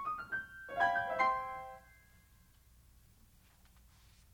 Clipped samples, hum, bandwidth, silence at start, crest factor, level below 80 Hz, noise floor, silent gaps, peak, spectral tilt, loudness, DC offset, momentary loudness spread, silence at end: under 0.1%; none; over 20 kHz; 0 s; 22 dB; -66 dBFS; -65 dBFS; none; -18 dBFS; -4 dB/octave; -36 LUFS; under 0.1%; 16 LU; 2.55 s